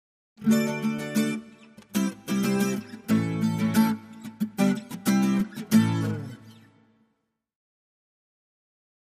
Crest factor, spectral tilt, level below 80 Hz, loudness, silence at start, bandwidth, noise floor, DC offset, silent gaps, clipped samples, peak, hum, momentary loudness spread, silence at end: 18 dB; -6 dB/octave; -66 dBFS; -26 LUFS; 0.4 s; 15.5 kHz; -76 dBFS; under 0.1%; none; under 0.1%; -8 dBFS; none; 11 LU; 2.5 s